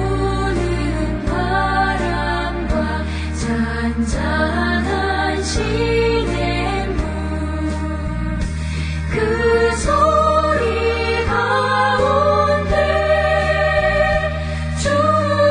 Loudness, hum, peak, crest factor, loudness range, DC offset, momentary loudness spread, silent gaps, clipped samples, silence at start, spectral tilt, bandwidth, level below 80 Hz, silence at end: -18 LUFS; none; -4 dBFS; 14 dB; 4 LU; under 0.1%; 8 LU; none; under 0.1%; 0 s; -5.5 dB/octave; 10 kHz; -26 dBFS; 0 s